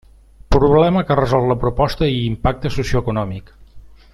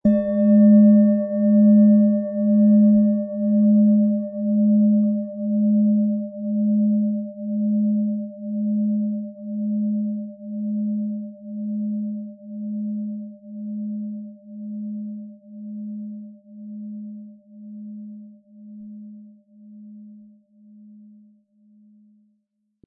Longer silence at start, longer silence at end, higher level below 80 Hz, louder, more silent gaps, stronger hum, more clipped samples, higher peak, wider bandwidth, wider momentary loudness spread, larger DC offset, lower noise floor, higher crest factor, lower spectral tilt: first, 0.5 s vs 0.05 s; second, 0.25 s vs 2.7 s; first, -28 dBFS vs -64 dBFS; first, -17 LUFS vs -20 LUFS; neither; neither; neither; first, -2 dBFS vs -6 dBFS; first, 13 kHz vs 1.9 kHz; second, 9 LU vs 23 LU; neither; second, -40 dBFS vs -72 dBFS; about the same, 16 dB vs 14 dB; second, -7.5 dB/octave vs -14.5 dB/octave